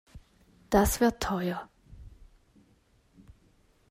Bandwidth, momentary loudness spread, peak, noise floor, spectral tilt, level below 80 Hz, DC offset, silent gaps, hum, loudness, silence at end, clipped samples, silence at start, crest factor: 16 kHz; 14 LU; -10 dBFS; -65 dBFS; -5 dB/octave; -46 dBFS; under 0.1%; none; none; -28 LUFS; 1.8 s; under 0.1%; 0.15 s; 24 dB